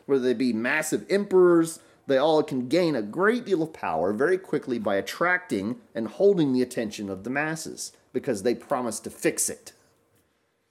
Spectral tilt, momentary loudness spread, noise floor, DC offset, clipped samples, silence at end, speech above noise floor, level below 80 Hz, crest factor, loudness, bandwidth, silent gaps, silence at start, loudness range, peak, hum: -4.5 dB/octave; 11 LU; -70 dBFS; under 0.1%; under 0.1%; 1 s; 45 dB; -70 dBFS; 16 dB; -25 LUFS; 16 kHz; none; 0.1 s; 6 LU; -10 dBFS; none